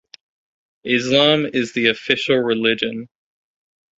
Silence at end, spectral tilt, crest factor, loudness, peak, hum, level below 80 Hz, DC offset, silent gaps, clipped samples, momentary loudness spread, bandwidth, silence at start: 0.95 s; -4.5 dB/octave; 20 dB; -17 LUFS; -2 dBFS; none; -60 dBFS; under 0.1%; none; under 0.1%; 10 LU; 8 kHz; 0.85 s